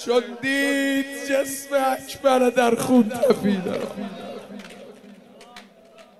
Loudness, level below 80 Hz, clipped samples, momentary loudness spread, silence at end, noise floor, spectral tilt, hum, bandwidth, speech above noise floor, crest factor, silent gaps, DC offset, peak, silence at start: -21 LUFS; -64 dBFS; under 0.1%; 18 LU; 0.2 s; -49 dBFS; -4.5 dB/octave; none; 15.5 kHz; 28 dB; 18 dB; none; 0.1%; -4 dBFS; 0 s